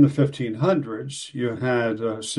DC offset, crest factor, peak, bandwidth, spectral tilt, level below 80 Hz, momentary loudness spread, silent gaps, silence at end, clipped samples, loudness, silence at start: under 0.1%; 18 dB; -4 dBFS; 11.5 kHz; -6 dB/octave; -60 dBFS; 9 LU; none; 0 s; under 0.1%; -24 LUFS; 0 s